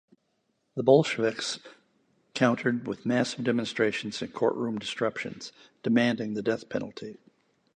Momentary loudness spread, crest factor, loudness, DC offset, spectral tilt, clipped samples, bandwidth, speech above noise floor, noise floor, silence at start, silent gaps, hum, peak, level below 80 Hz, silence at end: 17 LU; 22 dB; -28 LUFS; under 0.1%; -5 dB/octave; under 0.1%; 10 kHz; 47 dB; -75 dBFS; 0.75 s; none; none; -6 dBFS; -70 dBFS; 0.6 s